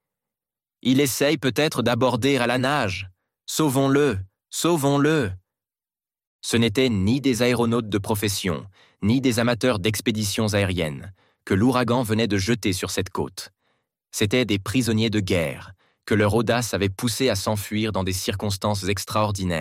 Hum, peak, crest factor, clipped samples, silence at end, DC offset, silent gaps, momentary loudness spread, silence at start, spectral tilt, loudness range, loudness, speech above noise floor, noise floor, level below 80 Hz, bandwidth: none; -6 dBFS; 16 dB; under 0.1%; 0 s; under 0.1%; 6.27-6.39 s; 10 LU; 0.85 s; -5 dB/octave; 2 LU; -22 LUFS; over 68 dB; under -90 dBFS; -54 dBFS; 16.5 kHz